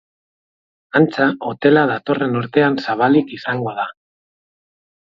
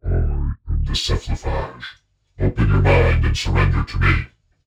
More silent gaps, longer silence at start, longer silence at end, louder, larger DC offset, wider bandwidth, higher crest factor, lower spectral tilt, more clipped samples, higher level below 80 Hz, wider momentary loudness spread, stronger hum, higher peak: neither; first, 0.95 s vs 0.05 s; first, 1.2 s vs 0.4 s; first, -17 LUFS vs -20 LUFS; neither; second, 7 kHz vs 10 kHz; about the same, 18 dB vs 18 dB; first, -8 dB/octave vs -6 dB/octave; neither; second, -62 dBFS vs -22 dBFS; second, 9 LU vs 12 LU; neither; about the same, 0 dBFS vs 0 dBFS